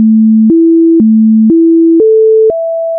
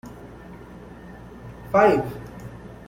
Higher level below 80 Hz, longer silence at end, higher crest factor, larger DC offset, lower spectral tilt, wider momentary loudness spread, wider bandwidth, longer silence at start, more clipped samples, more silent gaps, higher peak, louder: about the same, -50 dBFS vs -48 dBFS; second, 0 s vs 0.15 s; second, 4 dB vs 22 dB; neither; first, -16.5 dB/octave vs -7 dB/octave; second, 2 LU vs 24 LU; second, 0.8 kHz vs 16.5 kHz; about the same, 0 s vs 0.05 s; neither; neither; about the same, -2 dBFS vs -4 dBFS; first, -6 LUFS vs -20 LUFS